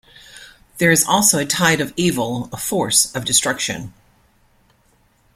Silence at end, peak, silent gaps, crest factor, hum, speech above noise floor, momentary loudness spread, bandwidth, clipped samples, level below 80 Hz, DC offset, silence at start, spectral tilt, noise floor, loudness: 1.45 s; 0 dBFS; none; 20 dB; none; 40 dB; 11 LU; 16.5 kHz; under 0.1%; -52 dBFS; under 0.1%; 0.35 s; -2.5 dB/octave; -58 dBFS; -16 LUFS